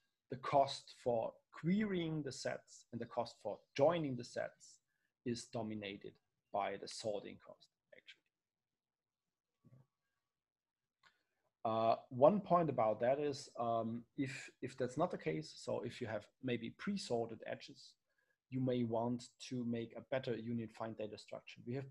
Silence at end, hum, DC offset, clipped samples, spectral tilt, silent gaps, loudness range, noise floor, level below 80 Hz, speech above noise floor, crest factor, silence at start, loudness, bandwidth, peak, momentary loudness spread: 0 s; none; under 0.1%; under 0.1%; -6 dB/octave; none; 10 LU; under -90 dBFS; -78 dBFS; over 50 dB; 24 dB; 0.3 s; -40 LUFS; 11.5 kHz; -16 dBFS; 14 LU